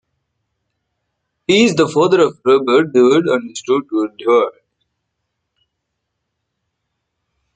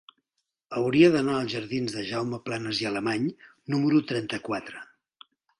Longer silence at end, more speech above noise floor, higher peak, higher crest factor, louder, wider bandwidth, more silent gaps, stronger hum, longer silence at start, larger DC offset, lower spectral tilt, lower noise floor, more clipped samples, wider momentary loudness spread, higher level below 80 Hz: first, 3.05 s vs 0.75 s; first, 61 dB vs 56 dB; first, -2 dBFS vs -6 dBFS; about the same, 16 dB vs 20 dB; first, -14 LUFS vs -26 LUFS; second, 9.2 kHz vs 11 kHz; neither; neither; first, 1.5 s vs 0.7 s; neither; about the same, -5 dB/octave vs -6 dB/octave; second, -75 dBFS vs -81 dBFS; neither; second, 8 LU vs 14 LU; about the same, -62 dBFS vs -64 dBFS